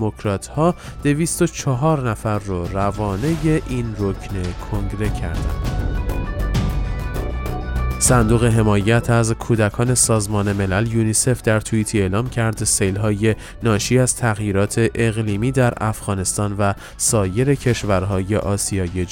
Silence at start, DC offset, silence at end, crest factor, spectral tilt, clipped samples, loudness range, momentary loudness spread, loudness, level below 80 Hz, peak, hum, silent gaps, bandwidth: 0 s; under 0.1%; 0 s; 18 dB; -5 dB/octave; under 0.1%; 6 LU; 9 LU; -19 LUFS; -30 dBFS; -2 dBFS; none; none; 17 kHz